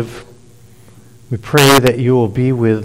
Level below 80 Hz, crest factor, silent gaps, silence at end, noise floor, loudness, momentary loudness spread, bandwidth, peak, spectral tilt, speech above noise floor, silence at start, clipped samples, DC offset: -42 dBFS; 14 dB; none; 0 s; -43 dBFS; -12 LUFS; 17 LU; 16.5 kHz; 0 dBFS; -5 dB/octave; 31 dB; 0 s; under 0.1%; under 0.1%